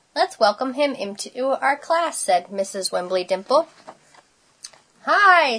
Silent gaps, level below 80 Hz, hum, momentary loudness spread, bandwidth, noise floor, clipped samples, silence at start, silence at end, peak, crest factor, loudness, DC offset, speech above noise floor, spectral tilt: none; -76 dBFS; none; 16 LU; 11 kHz; -55 dBFS; under 0.1%; 0.15 s; 0 s; -2 dBFS; 18 dB; -21 LUFS; under 0.1%; 35 dB; -2 dB/octave